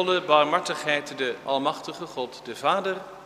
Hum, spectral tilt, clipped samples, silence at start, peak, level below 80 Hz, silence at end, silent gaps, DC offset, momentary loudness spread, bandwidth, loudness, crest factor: none; -3.5 dB/octave; under 0.1%; 0 s; -6 dBFS; -70 dBFS; 0 s; none; under 0.1%; 14 LU; 15 kHz; -25 LUFS; 20 dB